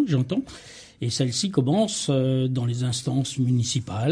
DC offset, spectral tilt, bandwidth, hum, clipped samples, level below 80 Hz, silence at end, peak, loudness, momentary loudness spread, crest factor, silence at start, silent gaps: under 0.1%; -5.5 dB/octave; 10.5 kHz; none; under 0.1%; -58 dBFS; 0 s; -8 dBFS; -24 LUFS; 8 LU; 16 dB; 0 s; none